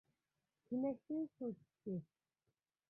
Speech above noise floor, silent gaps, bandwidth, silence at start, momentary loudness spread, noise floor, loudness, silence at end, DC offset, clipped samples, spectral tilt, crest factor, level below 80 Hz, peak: over 46 dB; none; 2.7 kHz; 0.7 s; 7 LU; under -90 dBFS; -45 LUFS; 0.85 s; under 0.1%; under 0.1%; -12 dB/octave; 18 dB; -86 dBFS; -30 dBFS